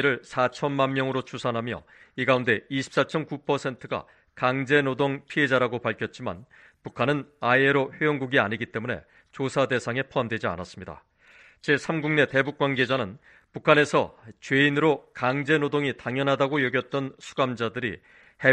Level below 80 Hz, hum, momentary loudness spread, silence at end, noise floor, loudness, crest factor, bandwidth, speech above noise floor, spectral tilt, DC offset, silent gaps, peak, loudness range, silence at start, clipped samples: -62 dBFS; none; 13 LU; 0 s; -55 dBFS; -25 LUFS; 24 dB; 9.8 kHz; 30 dB; -6 dB/octave; under 0.1%; none; -2 dBFS; 4 LU; 0 s; under 0.1%